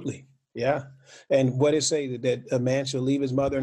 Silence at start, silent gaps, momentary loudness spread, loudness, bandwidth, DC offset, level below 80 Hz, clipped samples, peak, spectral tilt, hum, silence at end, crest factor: 0 s; none; 9 LU; -25 LUFS; 11.5 kHz; under 0.1%; -56 dBFS; under 0.1%; -8 dBFS; -5 dB/octave; none; 0 s; 16 dB